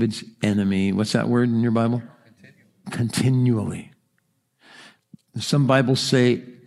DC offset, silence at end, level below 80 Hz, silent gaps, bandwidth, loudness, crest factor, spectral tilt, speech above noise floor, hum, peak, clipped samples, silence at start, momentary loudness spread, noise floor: under 0.1%; 0.15 s; -64 dBFS; none; 13.5 kHz; -21 LUFS; 20 dB; -6 dB/octave; 49 dB; none; -2 dBFS; under 0.1%; 0 s; 12 LU; -70 dBFS